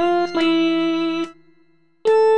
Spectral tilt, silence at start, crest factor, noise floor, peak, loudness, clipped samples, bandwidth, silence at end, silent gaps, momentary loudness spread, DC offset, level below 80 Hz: -5 dB/octave; 0 s; 12 dB; -59 dBFS; -8 dBFS; -19 LUFS; under 0.1%; 8.8 kHz; 0 s; none; 8 LU; under 0.1%; -64 dBFS